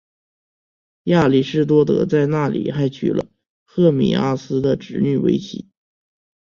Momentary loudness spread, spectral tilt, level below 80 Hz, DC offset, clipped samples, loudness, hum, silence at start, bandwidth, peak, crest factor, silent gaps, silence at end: 11 LU; -8 dB/octave; -52 dBFS; under 0.1%; under 0.1%; -18 LUFS; none; 1.05 s; 7.4 kHz; -2 dBFS; 16 dB; 3.50-3.66 s; 0.85 s